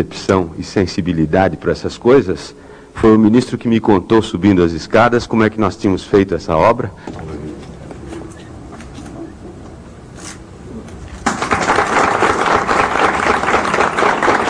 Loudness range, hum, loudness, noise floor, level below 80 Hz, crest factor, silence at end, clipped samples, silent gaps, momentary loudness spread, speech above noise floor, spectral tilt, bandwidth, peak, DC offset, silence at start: 18 LU; none; -14 LUFS; -34 dBFS; -38 dBFS; 16 dB; 0 s; under 0.1%; none; 20 LU; 21 dB; -5.5 dB/octave; 11 kHz; 0 dBFS; under 0.1%; 0 s